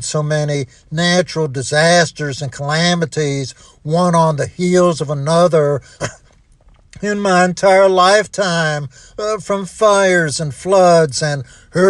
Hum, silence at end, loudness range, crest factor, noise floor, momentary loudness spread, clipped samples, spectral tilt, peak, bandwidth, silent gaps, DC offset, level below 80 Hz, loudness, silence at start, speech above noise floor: none; 0 s; 2 LU; 14 dB; -48 dBFS; 13 LU; under 0.1%; -4.5 dB/octave; 0 dBFS; 11.5 kHz; none; under 0.1%; -50 dBFS; -15 LUFS; 0 s; 34 dB